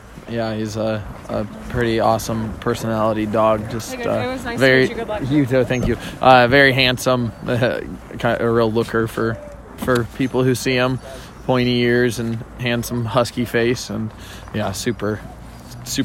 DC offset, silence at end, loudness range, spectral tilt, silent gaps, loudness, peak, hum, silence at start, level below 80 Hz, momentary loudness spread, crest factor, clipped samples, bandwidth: under 0.1%; 0 s; 6 LU; -5.5 dB/octave; none; -19 LUFS; 0 dBFS; none; 0 s; -40 dBFS; 14 LU; 18 dB; under 0.1%; 16.5 kHz